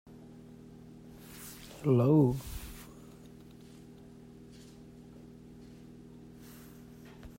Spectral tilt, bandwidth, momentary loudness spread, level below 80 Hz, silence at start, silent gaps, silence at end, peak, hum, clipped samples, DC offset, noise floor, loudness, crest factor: -8 dB/octave; 16 kHz; 26 LU; -56 dBFS; 1.3 s; none; 0.1 s; -16 dBFS; 60 Hz at -55 dBFS; under 0.1%; under 0.1%; -52 dBFS; -29 LUFS; 20 dB